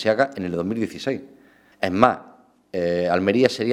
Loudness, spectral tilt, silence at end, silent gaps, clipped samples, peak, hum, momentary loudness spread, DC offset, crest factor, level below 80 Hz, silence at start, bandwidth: -22 LUFS; -6 dB/octave; 0 s; none; under 0.1%; 0 dBFS; none; 11 LU; under 0.1%; 22 dB; -58 dBFS; 0 s; 14 kHz